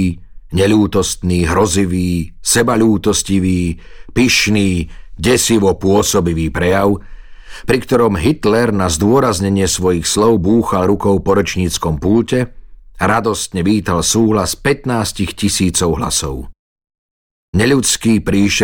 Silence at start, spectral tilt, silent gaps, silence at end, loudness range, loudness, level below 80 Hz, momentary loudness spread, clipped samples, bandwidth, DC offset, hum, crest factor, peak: 0 s; -4.5 dB/octave; 16.59-16.76 s, 16.98-17.53 s; 0 s; 2 LU; -14 LUFS; -32 dBFS; 7 LU; under 0.1%; 18.5 kHz; under 0.1%; none; 12 dB; -2 dBFS